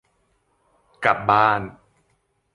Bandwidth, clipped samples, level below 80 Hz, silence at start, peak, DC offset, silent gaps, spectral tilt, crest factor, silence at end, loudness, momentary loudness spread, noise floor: 11 kHz; under 0.1%; -56 dBFS; 1 s; -2 dBFS; under 0.1%; none; -6 dB/octave; 22 dB; 0.85 s; -19 LUFS; 10 LU; -68 dBFS